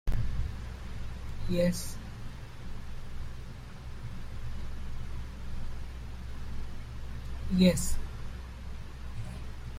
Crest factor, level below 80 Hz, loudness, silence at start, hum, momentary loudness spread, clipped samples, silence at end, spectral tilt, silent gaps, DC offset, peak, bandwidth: 22 dB; -38 dBFS; -36 LUFS; 0.05 s; none; 16 LU; under 0.1%; 0 s; -6 dB/octave; none; under 0.1%; -12 dBFS; 15.5 kHz